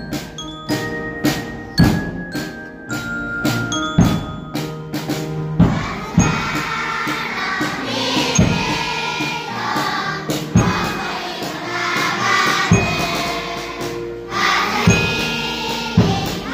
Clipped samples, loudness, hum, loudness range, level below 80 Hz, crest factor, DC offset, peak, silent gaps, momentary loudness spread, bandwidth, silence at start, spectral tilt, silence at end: under 0.1%; -19 LUFS; none; 3 LU; -36 dBFS; 18 dB; under 0.1%; 0 dBFS; none; 11 LU; 16 kHz; 0 s; -4.5 dB/octave; 0 s